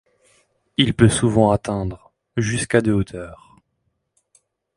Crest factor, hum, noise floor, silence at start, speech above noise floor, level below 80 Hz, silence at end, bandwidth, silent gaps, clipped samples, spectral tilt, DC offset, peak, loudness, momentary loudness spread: 20 dB; none; -72 dBFS; 0.8 s; 54 dB; -42 dBFS; 1.45 s; 11.5 kHz; none; under 0.1%; -5.5 dB/octave; under 0.1%; 0 dBFS; -19 LUFS; 16 LU